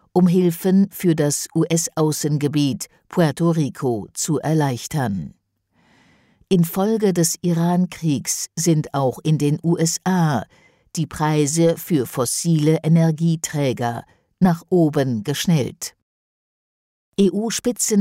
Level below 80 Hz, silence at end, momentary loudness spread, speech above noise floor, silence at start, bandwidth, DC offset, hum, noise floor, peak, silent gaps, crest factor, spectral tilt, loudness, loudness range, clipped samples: -56 dBFS; 0 s; 7 LU; 44 dB; 0.15 s; 16 kHz; under 0.1%; none; -63 dBFS; -6 dBFS; 16.02-17.12 s; 14 dB; -5.5 dB/octave; -20 LUFS; 3 LU; under 0.1%